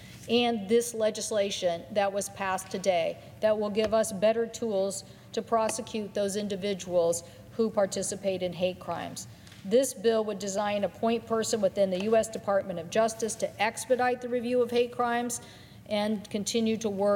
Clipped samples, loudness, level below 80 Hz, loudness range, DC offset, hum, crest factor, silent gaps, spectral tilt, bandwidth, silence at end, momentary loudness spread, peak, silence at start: under 0.1%; -29 LUFS; -64 dBFS; 2 LU; under 0.1%; none; 18 dB; none; -4 dB/octave; 17.5 kHz; 0 s; 7 LU; -12 dBFS; 0 s